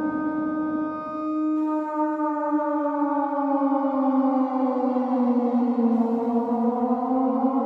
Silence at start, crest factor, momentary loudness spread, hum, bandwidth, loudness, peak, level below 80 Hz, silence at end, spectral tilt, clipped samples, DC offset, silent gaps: 0 s; 12 dB; 4 LU; none; 4.8 kHz; -24 LUFS; -10 dBFS; -70 dBFS; 0 s; -9 dB/octave; under 0.1%; under 0.1%; none